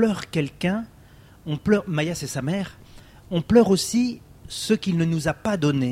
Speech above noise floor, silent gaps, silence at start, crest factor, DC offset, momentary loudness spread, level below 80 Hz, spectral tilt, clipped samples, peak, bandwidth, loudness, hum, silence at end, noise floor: 27 dB; none; 0 s; 20 dB; under 0.1%; 13 LU; -50 dBFS; -5.5 dB/octave; under 0.1%; -4 dBFS; 16 kHz; -23 LUFS; none; 0 s; -49 dBFS